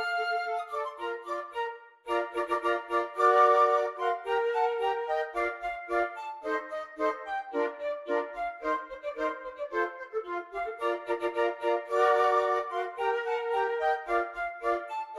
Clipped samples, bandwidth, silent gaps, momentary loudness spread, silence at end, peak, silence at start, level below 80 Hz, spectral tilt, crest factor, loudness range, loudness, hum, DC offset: under 0.1%; 12 kHz; none; 11 LU; 0 s; -12 dBFS; 0 s; -66 dBFS; -3 dB/octave; 18 dB; 7 LU; -30 LUFS; none; under 0.1%